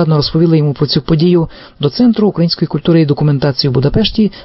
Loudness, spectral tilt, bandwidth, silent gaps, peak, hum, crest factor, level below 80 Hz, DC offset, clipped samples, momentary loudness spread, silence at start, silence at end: -12 LUFS; -10.5 dB/octave; 5.8 kHz; none; -2 dBFS; none; 10 dB; -32 dBFS; under 0.1%; under 0.1%; 4 LU; 0 s; 0 s